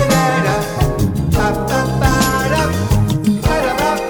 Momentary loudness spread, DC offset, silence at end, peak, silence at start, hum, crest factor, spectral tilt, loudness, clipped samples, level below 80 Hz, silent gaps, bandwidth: 3 LU; under 0.1%; 0 s; 0 dBFS; 0 s; none; 14 dB; -5.5 dB/octave; -15 LUFS; under 0.1%; -26 dBFS; none; 19.5 kHz